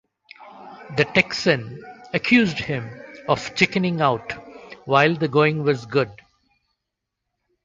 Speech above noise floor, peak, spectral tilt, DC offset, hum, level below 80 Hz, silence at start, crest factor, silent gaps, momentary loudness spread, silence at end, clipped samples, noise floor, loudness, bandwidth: 61 dB; -2 dBFS; -5.5 dB/octave; under 0.1%; none; -56 dBFS; 0.4 s; 20 dB; none; 20 LU; 1.5 s; under 0.1%; -82 dBFS; -21 LUFS; 7.8 kHz